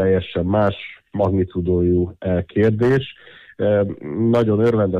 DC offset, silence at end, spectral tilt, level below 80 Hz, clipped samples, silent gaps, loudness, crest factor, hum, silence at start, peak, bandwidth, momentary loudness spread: under 0.1%; 0 s; -9 dB/octave; -44 dBFS; under 0.1%; none; -19 LUFS; 12 dB; none; 0 s; -6 dBFS; 7.6 kHz; 7 LU